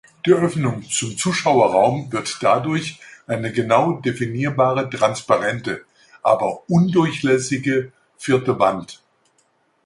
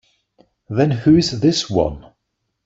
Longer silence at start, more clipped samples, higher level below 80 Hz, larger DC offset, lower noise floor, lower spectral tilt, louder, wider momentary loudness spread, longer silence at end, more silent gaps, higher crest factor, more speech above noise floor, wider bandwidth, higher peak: second, 0.25 s vs 0.7 s; neither; second, -58 dBFS vs -42 dBFS; neither; second, -63 dBFS vs -74 dBFS; about the same, -5.5 dB/octave vs -6 dB/octave; about the same, -19 LUFS vs -17 LUFS; about the same, 11 LU vs 11 LU; first, 0.9 s vs 0.65 s; neither; about the same, 18 dB vs 16 dB; second, 44 dB vs 58 dB; first, 11.5 kHz vs 8 kHz; about the same, -2 dBFS vs -4 dBFS